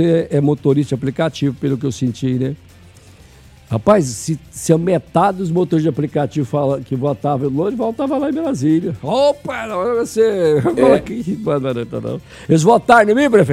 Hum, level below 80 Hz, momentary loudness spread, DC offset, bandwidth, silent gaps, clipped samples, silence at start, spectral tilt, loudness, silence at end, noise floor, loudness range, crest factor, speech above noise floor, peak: none; -48 dBFS; 11 LU; under 0.1%; 14.5 kHz; none; under 0.1%; 0 s; -6.5 dB/octave; -16 LUFS; 0 s; -43 dBFS; 4 LU; 16 dB; 28 dB; 0 dBFS